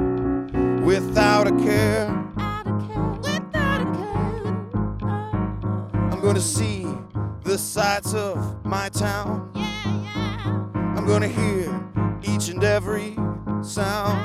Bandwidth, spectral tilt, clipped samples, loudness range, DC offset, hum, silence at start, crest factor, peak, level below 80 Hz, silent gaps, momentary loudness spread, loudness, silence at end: 15 kHz; -5.5 dB/octave; under 0.1%; 4 LU; under 0.1%; none; 0 s; 20 dB; -2 dBFS; -40 dBFS; none; 8 LU; -23 LUFS; 0 s